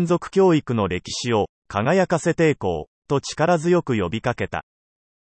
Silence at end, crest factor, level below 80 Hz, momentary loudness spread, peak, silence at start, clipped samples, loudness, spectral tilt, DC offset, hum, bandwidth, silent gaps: 0.65 s; 16 dB; -52 dBFS; 9 LU; -6 dBFS; 0 s; under 0.1%; -21 LUFS; -6 dB/octave; under 0.1%; none; 8.8 kHz; 1.49-1.62 s, 2.87-3.02 s